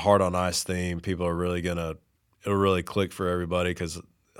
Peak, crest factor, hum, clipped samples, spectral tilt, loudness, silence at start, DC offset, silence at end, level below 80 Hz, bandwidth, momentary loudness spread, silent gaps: -6 dBFS; 22 dB; none; under 0.1%; -5 dB/octave; -27 LUFS; 0 s; under 0.1%; 0.4 s; -50 dBFS; 17 kHz; 11 LU; none